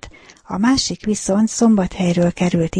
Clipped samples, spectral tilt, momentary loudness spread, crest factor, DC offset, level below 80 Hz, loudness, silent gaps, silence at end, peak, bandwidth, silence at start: under 0.1%; -5 dB/octave; 5 LU; 14 dB; under 0.1%; -42 dBFS; -17 LUFS; none; 0 s; -4 dBFS; 10.5 kHz; 0 s